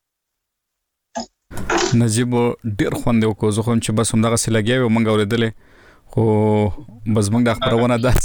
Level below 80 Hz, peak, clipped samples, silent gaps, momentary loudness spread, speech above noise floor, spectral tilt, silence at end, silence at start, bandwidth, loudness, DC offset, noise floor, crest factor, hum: -34 dBFS; -4 dBFS; under 0.1%; none; 11 LU; 62 dB; -5.5 dB/octave; 0 s; 1.15 s; over 20 kHz; -18 LUFS; under 0.1%; -79 dBFS; 14 dB; none